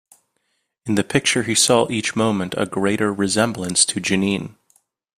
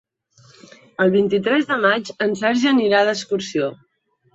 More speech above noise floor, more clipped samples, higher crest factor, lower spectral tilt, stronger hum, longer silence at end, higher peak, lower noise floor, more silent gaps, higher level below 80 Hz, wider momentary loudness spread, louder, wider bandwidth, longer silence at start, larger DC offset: first, 52 dB vs 35 dB; neither; about the same, 20 dB vs 18 dB; second, -3.5 dB/octave vs -5 dB/octave; neither; about the same, 0.65 s vs 0.6 s; about the same, 0 dBFS vs -2 dBFS; first, -71 dBFS vs -53 dBFS; neither; first, -56 dBFS vs -64 dBFS; about the same, 8 LU vs 8 LU; about the same, -19 LUFS vs -19 LUFS; first, 15 kHz vs 8 kHz; second, 0.85 s vs 1 s; neither